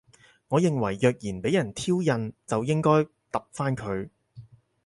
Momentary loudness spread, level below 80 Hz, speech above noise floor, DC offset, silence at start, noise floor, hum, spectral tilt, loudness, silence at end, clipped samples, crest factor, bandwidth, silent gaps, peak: 10 LU; -58 dBFS; 24 dB; under 0.1%; 0.5 s; -50 dBFS; none; -6.5 dB/octave; -26 LUFS; 0.4 s; under 0.1%; 18 dB; 11.5 kHz; none; -8 dBFS